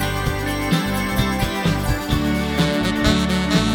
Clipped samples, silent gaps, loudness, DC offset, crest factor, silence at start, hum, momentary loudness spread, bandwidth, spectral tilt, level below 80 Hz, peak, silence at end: under 0.1%; none; -20 LUFS; under 0.1%; 18 dB; 0 s; none; 4 LU; 20 kHz; -5 dB/octave; -30 dBFS; -2 dBFS; 0 s